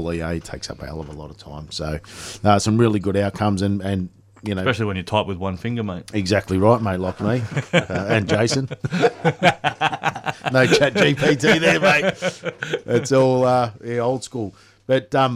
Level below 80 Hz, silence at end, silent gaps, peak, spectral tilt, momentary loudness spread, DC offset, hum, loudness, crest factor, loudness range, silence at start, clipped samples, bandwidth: -46 dBFS; 0 s; none; -2 dBFS; -5.5 dB/octave; 15 LU; under 0.1%; none; -20 LUFS; 18 dB; 5 LU; 0 s; under 0.1%; 15 kHz